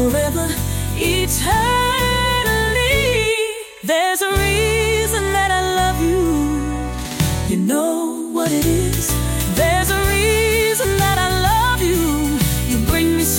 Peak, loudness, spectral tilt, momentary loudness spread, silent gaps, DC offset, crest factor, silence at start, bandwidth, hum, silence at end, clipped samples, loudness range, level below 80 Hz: -6 dBFS; -17 LUFS; -4 dB/octave; 5 LU; none; under 0.1%; 12 dB; 0 s; 17 kHz; none; 0 s; under 0.1%; 3 LU; -26 dBFS